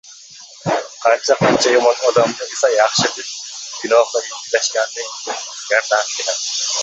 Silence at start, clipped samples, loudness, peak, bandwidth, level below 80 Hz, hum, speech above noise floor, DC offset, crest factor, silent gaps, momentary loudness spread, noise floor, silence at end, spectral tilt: 0.05 s; under 0.1%; -17 LUFS; 0 dBFS; 8.2 kHz; -60 dBFS; none; 23 dB; under 0.1%; 18 dB; none; 13 LU; -40 dBFS; 0 s; -2 dB/octave